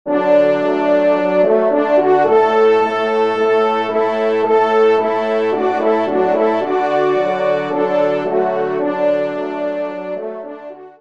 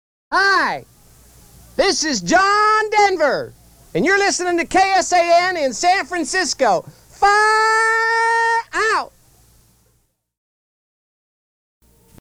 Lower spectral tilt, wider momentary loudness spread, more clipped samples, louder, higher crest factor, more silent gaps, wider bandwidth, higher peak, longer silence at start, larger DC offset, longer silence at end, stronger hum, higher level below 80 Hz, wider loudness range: first, -6.5 dB/octave vs -2 dB/octave; about the same, 9 LU vs 8 LU; neither; about the same, -15 LUFS vs -16 LUFS; about the same, 14 dB vs 16 dB; neither; second, 7.4 kHz vs 16.5 kHz; about the same, -2 dBFS vs -4 dBFS; second, 0.05 s vs 0.3 s; first, 0.4% vs under 0.1%; second, 0.1 s vs 3.15 s; neither; second, -68 dBFS vs -50 dBFS; about the same, 4 LU vs 5 LU